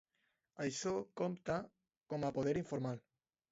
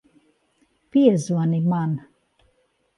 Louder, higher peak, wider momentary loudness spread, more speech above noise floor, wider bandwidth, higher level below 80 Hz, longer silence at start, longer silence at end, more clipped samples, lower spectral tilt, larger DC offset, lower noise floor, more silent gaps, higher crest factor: second, -41 LUFS vs -21 LUFS; second, -24 dBFS vs -4 dBFS; about the same, 7 LU vs 9 LU; about the same, 44 dB vs 47 dB; second, 7.6 kHz vs 11.5 kHz; about the same, -70 dBFS vs -68 dBFS; second, 0.55 s vs 0.95 s; second, 0.55 s vs 1 s; neither; second, -6 dB/octave vs -8 dB/octave; neither; first, -84 dBFS vs -66 dBFS; first, 1.97-2.01 s vs none; about the same, 18 dB vs 20 dB